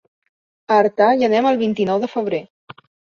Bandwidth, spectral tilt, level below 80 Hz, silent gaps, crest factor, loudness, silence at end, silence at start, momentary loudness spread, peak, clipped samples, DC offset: 7 kHz; -6.5 dB/octave; -66 dBFS; 2.50-2.67 s; 16 dB; -17 LUFS; 0.45 s; 0.7 s; 9 LU; -2 dBFS; under 0.1%; under 0.1%